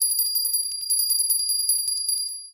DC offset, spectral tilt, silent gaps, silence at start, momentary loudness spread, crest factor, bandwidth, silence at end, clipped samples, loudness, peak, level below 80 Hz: under 0.1%; 6 dB/octave; none; 0 s; 4 LU; 14 dB; 17 kHz; 0.05 s; under 0.1%; -21 LUFS; -10 dBFS; -78 dBFS